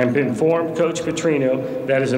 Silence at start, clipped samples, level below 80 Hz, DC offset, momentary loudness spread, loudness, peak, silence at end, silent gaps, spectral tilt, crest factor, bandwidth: 0 s; under 0.1%; -56 dBFS; under 0.1%; 3 LU; -20 LUFS; -4 dBFS; 0 s; none; -6 dB/octave; 14 dB; 15.5 kHz